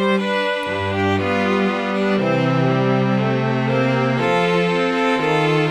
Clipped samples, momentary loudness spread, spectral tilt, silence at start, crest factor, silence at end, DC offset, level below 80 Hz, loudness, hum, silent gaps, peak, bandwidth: under 0.1%; 3 LU; -7 dB/octave; 0 s; 12 dB; 0 s; under 0.1%; -56 dBFS; -18 LUFS; none; none; -6 dBFS; 11 kHz